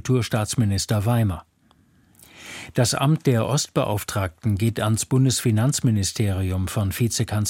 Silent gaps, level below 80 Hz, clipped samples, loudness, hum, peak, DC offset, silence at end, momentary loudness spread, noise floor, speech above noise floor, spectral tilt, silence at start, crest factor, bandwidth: none; -48 dBFS; under 0.1%; -22 LUFS; none; -6 dBFS; under 0.1%; 0 s; 6 LU; -59 dBFS; 37 dB; -5 dB/octave; 0.05 s; 16 dB; 16.5 kHz